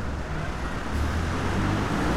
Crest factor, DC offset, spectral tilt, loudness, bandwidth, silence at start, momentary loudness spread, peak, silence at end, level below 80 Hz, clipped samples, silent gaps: 14 dB; under 0.1%; -6 dB/octave; -28 LUFS; 15 kHz; 0 s; 6 LU; -12 dBFS; 0 s; -34 dBFS; under 0.1%; none